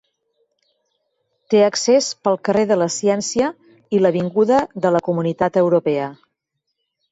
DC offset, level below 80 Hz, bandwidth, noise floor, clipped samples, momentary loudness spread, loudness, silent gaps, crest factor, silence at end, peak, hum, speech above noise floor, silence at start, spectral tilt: under 0.1%; -60 dBFS; 8 kHz; -76 dBFS; under 0.1%; 6 LU; -18 LUFS; none; 16 dB; 1 s; -4 dBFS; none; 59 dB; 1.5 s; -5 dB/octave